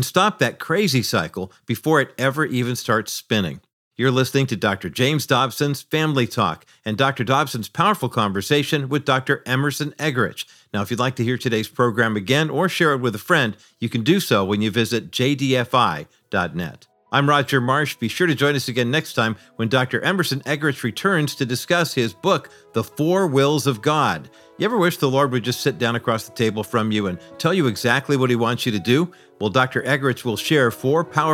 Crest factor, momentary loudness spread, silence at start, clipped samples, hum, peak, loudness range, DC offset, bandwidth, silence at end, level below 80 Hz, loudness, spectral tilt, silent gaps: 18 dB; 7 LU; 0 s; under 0.1%; none; -2 dBFS; 2 LU; under 0.1%; 17 kHz; 0 s; -62 dBFS; -20 LUFS; -5 dB/octave; 3.73-3.91 s